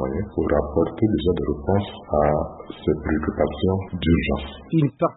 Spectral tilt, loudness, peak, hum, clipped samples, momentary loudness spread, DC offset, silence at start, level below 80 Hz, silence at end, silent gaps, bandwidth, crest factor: -12 dB/octave; -23 LUFS; -6 dBFS; none; under 0.1%; 5 LU; under 0.1%; 0 s; -36 dBFS; 0 s; none; 4.1 kHz; 16 dB